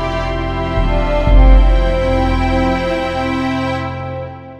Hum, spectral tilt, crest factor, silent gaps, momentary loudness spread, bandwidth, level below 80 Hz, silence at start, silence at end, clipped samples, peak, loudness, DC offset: none; -7.5 dB/octave; 14 dB; none; 10 LU; 7.4 kHz; -16 dBFS; 0 s; 0 s; under 0.1%; 0 dBFS; -16 LUFS; 0.3%